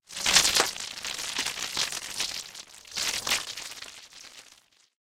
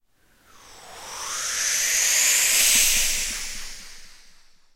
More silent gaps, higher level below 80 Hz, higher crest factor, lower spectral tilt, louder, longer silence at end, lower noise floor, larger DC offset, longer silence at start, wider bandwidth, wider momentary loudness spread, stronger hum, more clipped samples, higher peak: neither; second, -58 dBFS vs -42 dBFS; first, 28 dB vs 20 dB; first, 1 dB/octave vs 2.5 dB/octave; second, -26 LUFS vs -19 LUFS; about the same, 0.6 s vs 0.6 s; about the same, -59 dBFS vs -59 dBFS; neither; second, 0.1 s vs 0.7 s; about the same, 16.5 kHz vs 16 kHz; about the same, 23 LU vs 21 LU; neither; neither; first, -2 dBFS vs -6 dBFS